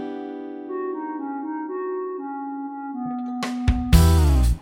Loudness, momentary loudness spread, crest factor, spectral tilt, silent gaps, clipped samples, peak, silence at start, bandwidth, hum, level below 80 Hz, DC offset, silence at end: -24 LUFS; 15 LU; 20 dB; -6.5 dB/octave; none; under 0.1%; -2 dBFS; 0 s; 16.5 kHz; none; -24 dBFS; under 0.1%; 0 s